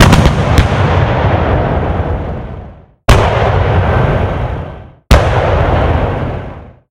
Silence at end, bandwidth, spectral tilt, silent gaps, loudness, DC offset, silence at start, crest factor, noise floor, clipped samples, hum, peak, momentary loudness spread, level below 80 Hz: 0.2 s; 16.5 kHz; -6.5 dB/octave; none; -12 LUFS; under 0.1%; 0 s; 12 dB; -32 dBFS; 0.8%; none; 0 dBFS; 14 LU; -18 dBFS